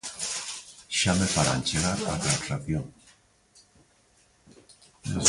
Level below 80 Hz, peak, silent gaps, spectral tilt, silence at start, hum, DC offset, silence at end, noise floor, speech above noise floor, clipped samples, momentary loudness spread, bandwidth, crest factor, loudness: -48 dBFS; -4 dBFS; none; -3 dB/octave; 0.05 s; none; under 0.1%; 0 s; -63 dBFS; 36 dB; under 0.1%; 13 LU; 11.5 kHz; 26 dB; -27 LUFS